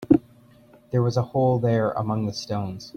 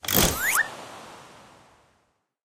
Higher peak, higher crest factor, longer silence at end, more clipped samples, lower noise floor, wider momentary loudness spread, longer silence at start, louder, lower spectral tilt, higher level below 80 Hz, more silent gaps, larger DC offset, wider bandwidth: about the same, -4 dBFS vs -4 dBFS; about the same, 20 dB vs 24 dB; second, 0.05 s vs 1.3 s; neither; second, -53 dBFS vs -70 dBFS; second, 8 LU vs 24 LU; about the same, 0 s vs 0.05 s; about the same, -24 LUFS vs -22 LUFS; first, -7.5 dB/octave vs -2 dB/octave; second, -54 dBFS vs -42 dBFS; neither; neither; second, 7 kHz vs 17 kHz